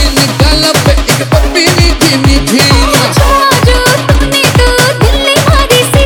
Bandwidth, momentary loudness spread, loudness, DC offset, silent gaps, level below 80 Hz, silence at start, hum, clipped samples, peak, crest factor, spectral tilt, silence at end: 20 kHz; 2 LU; -7 LUFS; under 0.1%; none; -14 dBFS; 0 s; none; 0.4%; 0 dBFS; 6 dB; -4 dB/octave; 0 s